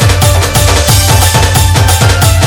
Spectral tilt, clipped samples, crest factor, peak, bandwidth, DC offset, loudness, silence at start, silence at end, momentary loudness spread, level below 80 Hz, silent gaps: -3.5 dB/octave; 2%; 6 dB; 0 dBFS; over 20 kHz; under 0.1%; -7 LUFS; 0 s; 0 s; 1 LU; -16 dBFS; none